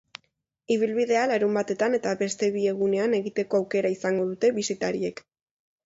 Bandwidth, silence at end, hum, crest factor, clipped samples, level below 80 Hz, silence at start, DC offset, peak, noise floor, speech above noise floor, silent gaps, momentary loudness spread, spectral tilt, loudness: 8 kHz; 0.75 s; none; 14 dB; under 0.1%; -70 dBFS; 0.7 s; under 0.1%; -12 dBFS; -72 dBFS; 47 dB; none; 5 LU; -5 dB/octave; -25 LUFS